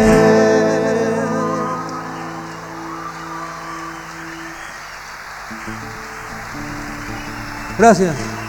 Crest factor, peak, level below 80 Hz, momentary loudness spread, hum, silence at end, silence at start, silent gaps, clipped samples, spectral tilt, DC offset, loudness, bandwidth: 18 dB; 0 dBFS; -40 dBFS; 18 LU; none; 0 s; 0 s; none; under 0.1%; -5.5 dB/octave; under 0.1%; -19 LUFS; 19.5 kHz